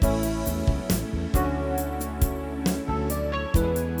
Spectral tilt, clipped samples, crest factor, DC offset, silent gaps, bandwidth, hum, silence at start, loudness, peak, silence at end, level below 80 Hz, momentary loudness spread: -6 dB/octave; under 0.1%; 16 dB; under 0.1%; none; over 20 kHz; none; 0 s; -27 LUFS; -8 dBFS; 0 s; -30 dBFS; 3 LU